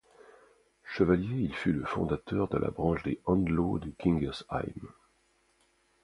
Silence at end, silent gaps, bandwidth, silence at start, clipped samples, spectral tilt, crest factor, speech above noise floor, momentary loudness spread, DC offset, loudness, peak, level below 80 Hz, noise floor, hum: 1.1 s; none; 11 kHz; 0.85 s; under 0.1%; -8.5 dB/octave; 20 dB; 40 dB; 9 LU; under 0.1%; -31 LUFS; -10 dBFS; -48 dBFS; -70 dBFS; none